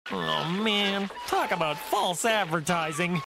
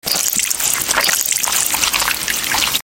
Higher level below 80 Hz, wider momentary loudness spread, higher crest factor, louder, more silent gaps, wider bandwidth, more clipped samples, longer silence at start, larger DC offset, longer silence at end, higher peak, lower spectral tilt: second, -62 dBFS vs -46 dBFS; about the same, 4 LU vs 2 LU; about the same, 16 dB vs 18 dB; second, -27 LUFS vs -14 LUFS; neither; second, 16 kHz vs over 20 kHz; neither; about the same, 0.05 s vs 0.05 s; neither; about the same, 0 s vs 0.05 s; second, -12 dBFS vs 0 dBFS; first, -3.5 dB/octave vs 1 dB/octave